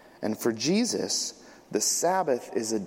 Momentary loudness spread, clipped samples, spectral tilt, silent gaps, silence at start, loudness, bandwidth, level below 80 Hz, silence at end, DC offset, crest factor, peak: 8 LU; under 0.1%; -3 dB/octave; none; 0.2 s; -27 LUFS; 16.5 kHz; -72 dBFS; 0 s; under 0.1%; 16 dB; -12 dBFS